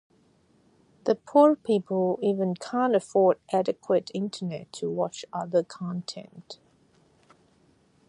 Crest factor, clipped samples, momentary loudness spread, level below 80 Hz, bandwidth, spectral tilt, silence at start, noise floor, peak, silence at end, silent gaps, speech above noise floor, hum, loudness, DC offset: 20 dB; under 0.1%; 15 LU; -74 dBFS; 11 kHz; -6.5 dB/octave; 1.05 s; -63 dBFS; -6 dBFS; 1.55 s; none; 38 dB; none; -26 LUFS; under 0.1%